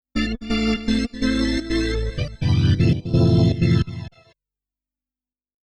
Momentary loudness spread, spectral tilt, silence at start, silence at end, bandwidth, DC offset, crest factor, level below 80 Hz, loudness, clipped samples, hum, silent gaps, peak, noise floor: 8 LU; -7 dB/octave; 0.15 s; 1.7 s; 11 kHz; under 0.1%; 12 dB; -32 dBFS; -21 LUFS; under 0.1%; 50 Hz at -40 dBFS; none; -8 dBFS; under -90 dBFS